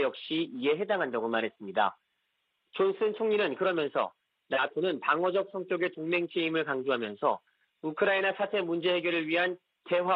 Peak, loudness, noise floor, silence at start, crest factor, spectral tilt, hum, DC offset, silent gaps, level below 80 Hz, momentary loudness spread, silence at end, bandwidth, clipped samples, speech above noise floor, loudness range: -12 dBFS; -30 LUFS; -78 dBFS; 0 s; 18 dB; -8 dB/octave; none; under 0.1%; none; -80 dBFS; 5 LU; 0 s; 5.4 kHz; under 0.1%; 49 dB; 1 LU